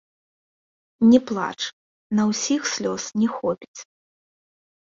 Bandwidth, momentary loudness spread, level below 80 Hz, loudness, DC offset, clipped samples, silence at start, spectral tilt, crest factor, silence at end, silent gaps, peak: 7.6 kHz; 14 LU; -64 dBFS; -22 LUFS; under 0.1%; under 0.1%; 1 s; -4 dB/octave; 20 dB; 1 s; 1.73-2.10 s, 3.68-3.74 s; -4 dBFS